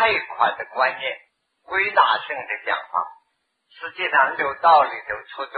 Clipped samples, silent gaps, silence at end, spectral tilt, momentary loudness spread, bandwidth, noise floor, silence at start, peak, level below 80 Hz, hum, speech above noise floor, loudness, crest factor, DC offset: under 0.1%; none; 0 s; -5.5 dB/octave; 14 LU; 4.9 kHz; -71 dBFS; 0 s; -4 dBFS; -64 dBFS; none; 50 dB; -21 LUFS; 20 dB; under 0.1%